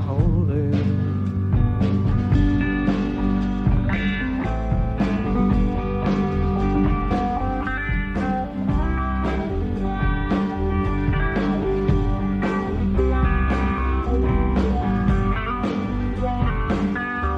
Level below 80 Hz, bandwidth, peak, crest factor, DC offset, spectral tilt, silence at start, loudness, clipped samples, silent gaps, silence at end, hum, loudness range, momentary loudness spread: -26 dBFS; 7.4 kHz; -6 dBFS; 14 dB; under 0.1%; -9 dB/octave; 0 s; -22 LUFS; under 0.1%; none; 0 s; none; 2 LU; 4 LU